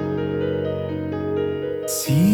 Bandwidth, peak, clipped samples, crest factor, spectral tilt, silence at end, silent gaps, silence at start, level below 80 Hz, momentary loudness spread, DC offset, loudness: over 20 kHz; -8 dBFS; under 0.1%; 14 dB; -6 dB/octave; 0 s; none; 0 s; -52 dBFS; 5 LU; under 0.1%; -24 LUFS